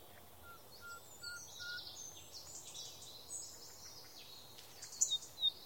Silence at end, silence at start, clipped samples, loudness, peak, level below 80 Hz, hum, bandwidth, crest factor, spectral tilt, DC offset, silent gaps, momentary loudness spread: 0 s; 0 s; under 0.1%; -43 LUFS; -16 dBFS; -76 dBFS; none; 17 kHz; 30 dB; 1 dB/octave; under 0.1%; none; 19 LU